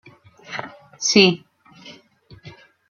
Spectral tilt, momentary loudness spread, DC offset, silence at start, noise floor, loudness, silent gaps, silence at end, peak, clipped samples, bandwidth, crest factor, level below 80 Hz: -3.5 dB/octave; 19 LU; under 0.1%; 0.5 s; -49 dBFS; -17 LUFS; none; 0.4 s; 0 dBFS; under 0.1%; 7.4 kHz; 22 dB; -64 dBFS